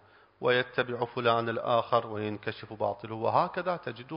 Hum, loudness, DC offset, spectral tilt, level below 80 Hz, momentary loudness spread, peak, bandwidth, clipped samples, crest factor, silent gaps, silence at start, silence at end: none; -30 LUFS; under 0.1%; -9.5 dB/octave; -68 dBFS; 8 LU; -12 dBFS; 5.4 kHz; under 0.1%; 20 dB; none; 0.4 s; 0 s